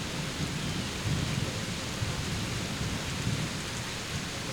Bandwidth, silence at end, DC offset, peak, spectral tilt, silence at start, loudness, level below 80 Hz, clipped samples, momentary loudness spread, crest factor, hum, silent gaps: over 20 kHz; 0 s; under 0.1%; -18 dBFS; -4 dB/octave; 0 s; -33 LUFS; -46 dBFS; under 0.1%; 3 LU; 16 dB; none; none